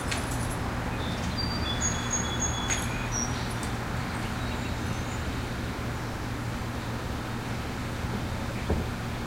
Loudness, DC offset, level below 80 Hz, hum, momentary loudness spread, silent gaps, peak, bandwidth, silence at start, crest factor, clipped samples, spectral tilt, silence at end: -31 LUFS; under 0.1%; -38 dBFS; none; 6 LU; none; -14 dBFS; 16 kHz; 0 s; 16 dB; under 0.1%; -4 dB/octave; 0 s